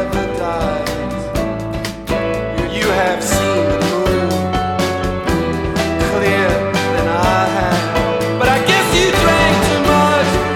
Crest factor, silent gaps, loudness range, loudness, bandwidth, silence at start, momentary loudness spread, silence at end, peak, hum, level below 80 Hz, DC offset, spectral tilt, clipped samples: 14 dB; none; 5 LU; -15 LUFS; 18.5 kHz; 0 s; 8 LU; 0 s; 0 dBFS; none; -30 dBFS; under 0.1%; -4.5 dB/octave; under 0.1%